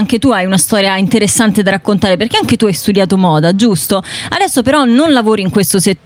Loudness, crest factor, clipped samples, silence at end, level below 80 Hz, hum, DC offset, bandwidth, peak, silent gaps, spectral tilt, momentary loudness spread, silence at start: -10 LUFS; 10 dB; under 0.1%; 0.1 s; -44 dBFS; none; under 0.1%; 16.5 kHz; 0 dBFS; none; -4.5 dB/octave; 3 LU; 0 s